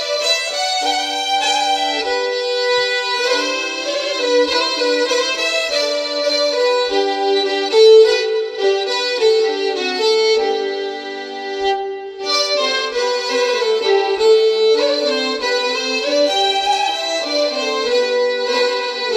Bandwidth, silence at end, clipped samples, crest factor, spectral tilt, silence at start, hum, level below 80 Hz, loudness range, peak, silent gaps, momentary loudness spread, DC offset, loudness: 13.5 kHz; 0 s; under 0.1%; 16 dB; 0.5 dB/octave; 0 s; none; -60 dBFS; 4 LU; -2 dBFS; none; 6 LU; under 0.1%; -16 LUFS